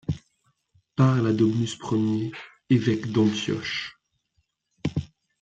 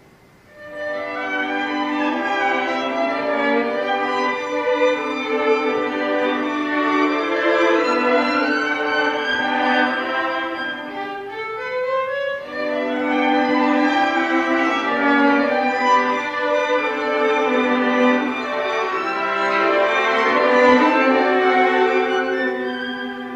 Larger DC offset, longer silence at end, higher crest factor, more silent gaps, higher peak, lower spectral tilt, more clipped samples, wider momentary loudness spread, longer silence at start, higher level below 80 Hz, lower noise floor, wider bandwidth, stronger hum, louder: neither; first, 0.35 s vs 0 s; about the same, 18 dB vs 18 dB; neither; second, -8 dBFS vs -2 dBFS; first, -6.5 dB/octave vs -4 dB/octave; neither; first, 13 LU vs 9 LU; second, 0.1 s vs 0.55 s; first, -56 dBFS vs -62 dBFS; first, -73 dBFS vs -49 dBFS; about the same, 8.8 kHz vs 8.8 kHz; neither; second, -25 LUFS vs -19 LUFS